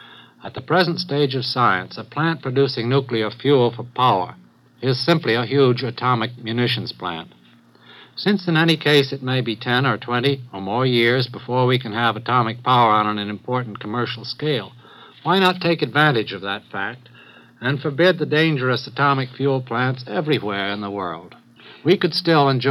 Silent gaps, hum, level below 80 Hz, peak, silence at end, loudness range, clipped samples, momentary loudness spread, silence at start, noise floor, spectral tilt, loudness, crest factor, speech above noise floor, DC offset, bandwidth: none; none; -70 dBFS; -4 dBFS; 0 s; 3 LU; under 0.1%; 11 LU; 0 s; -50 dBFS; -7 dB/octave; -20 LUFS; 18 dB; 30 dB; under 0.1%; 14 kHz